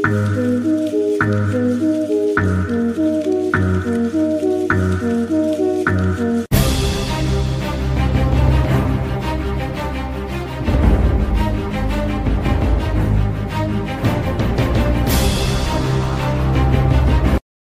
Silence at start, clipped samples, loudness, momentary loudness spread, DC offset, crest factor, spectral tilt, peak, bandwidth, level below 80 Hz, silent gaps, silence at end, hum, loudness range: 0 s; under 0.1%; -18 LUFS; 5 LU; under 0.1%; 14 dB; -6.5 dB/octave; -2 dBFS; 16 kHz; -22 dBFS; none; 0.2 s; none; 2 LU